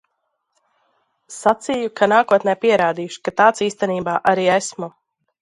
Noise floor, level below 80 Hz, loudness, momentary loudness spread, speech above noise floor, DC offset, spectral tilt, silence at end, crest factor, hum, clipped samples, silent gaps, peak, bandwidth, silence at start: -73 dBFS; -62 dBFS; -18 LUFS; 11 LU; 55 dB; under 0.1%; -4 dB/octave; 0.55 s; 18 dB; none; under 0.1%; none; 0 dBFS; 11.5 kHz; 1.3 s